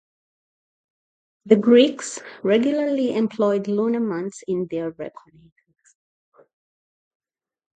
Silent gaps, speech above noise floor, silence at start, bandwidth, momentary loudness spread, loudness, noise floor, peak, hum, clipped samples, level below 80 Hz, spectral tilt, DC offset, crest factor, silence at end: none; over 70 dB; 1.45 s; 9.2 kHz; 16 LU; -21 LUFS; under -90 dBFS; -2 dBFS; none; under 0.1%; -72 dBFS; -5.5 dB/octave; under 0.1%; 22 dB; 2.7 s